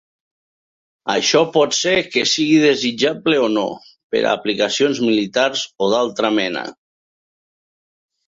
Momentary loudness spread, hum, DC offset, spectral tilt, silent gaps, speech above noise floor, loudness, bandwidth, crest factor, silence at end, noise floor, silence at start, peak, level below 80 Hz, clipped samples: 9 LU; none; under 0.1%; -3 dB/octave; 4.03-4.10 s; over 73 dB; -17 LUFS; 7.8 kHz; 16 dB; 1.55 s; under -90 dBFS; 1.05 s; -2 dBFS; -62 dBFS; under 0.1%